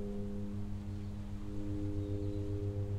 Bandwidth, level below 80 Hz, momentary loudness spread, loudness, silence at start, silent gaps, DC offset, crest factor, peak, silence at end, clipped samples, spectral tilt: 9.2 kHz; -46 dBFS; 5 LU; -41 LUFS; 0 s; none; under 0.1%; 12 dB; -26 dBFS; 0 s; under 0.1%; -9 dB/octave